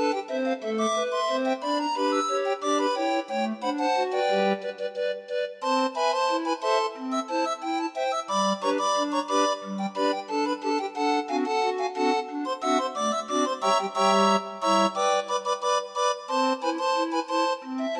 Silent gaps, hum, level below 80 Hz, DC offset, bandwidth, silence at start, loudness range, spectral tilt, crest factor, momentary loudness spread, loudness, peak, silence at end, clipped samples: none; none; -82 dBFS; under 0.1%; 12 kHz; 0 s; 3 LU; -3.5 dB/octave; 16 dB; 5 LU; -26 LUFS; -10 dBFS; 0 s; under 0.1%